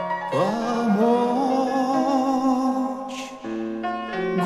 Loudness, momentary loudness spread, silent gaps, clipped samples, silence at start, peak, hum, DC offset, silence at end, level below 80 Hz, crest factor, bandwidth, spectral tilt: -23 LUFS; 11 LU; none; under 0.1%; 0 s; -8 dBFS; none; under 0.1%; 0 s; -60 dBFS; 14 dB; 13 kHz; -6 dB/octave